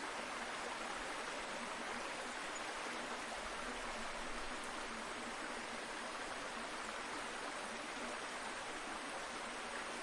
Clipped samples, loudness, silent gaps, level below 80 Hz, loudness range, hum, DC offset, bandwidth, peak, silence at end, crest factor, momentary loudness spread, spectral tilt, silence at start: under 0.1%; -44 LUFS; none; -64 dBFS; 1 LU; none; under 0.1%; 11.5 kHz; -30 dBFS; 0 s; 16 dB; 1 LU; -1.5 dB/octave; 0 s